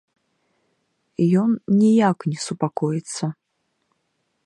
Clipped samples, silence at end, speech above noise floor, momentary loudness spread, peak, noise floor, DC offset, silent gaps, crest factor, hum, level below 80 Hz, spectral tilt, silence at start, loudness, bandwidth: under 0.1%; 1.15 s; 53 dB; 12 LU; -6 dBFS; -73 dBFS; under 0.1%; none; 18 dB; none; -70 dBFS; -6.5 dB/octave; 1.2 s; -21 LUFS; 11.5 kHz